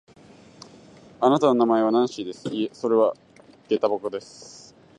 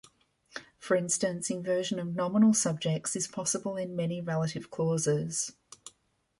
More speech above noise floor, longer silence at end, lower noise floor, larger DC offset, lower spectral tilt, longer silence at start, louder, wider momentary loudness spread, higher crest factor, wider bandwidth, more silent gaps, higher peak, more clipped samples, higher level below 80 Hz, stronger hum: second, 28 dB vs 41 dB; about the same, 0.4 s vs 0.5 s; second, -50 dBFS vs -71 dBFS; neither; first, -6 dB/octave vs -4.5 dB/octave; first, 1.2 s vs 0.55 s; first, -23 LUFS vs -30 LUFS; about the same, 21 LU vs 20 LU; about the same, 20 dB vs 18 dB; second, 10 kHz vs 11.5 kHz; neither; first, -4 dBFS vs -12 dBFS; neither; about the same, -72 dBFS vs -70 dBFS; neither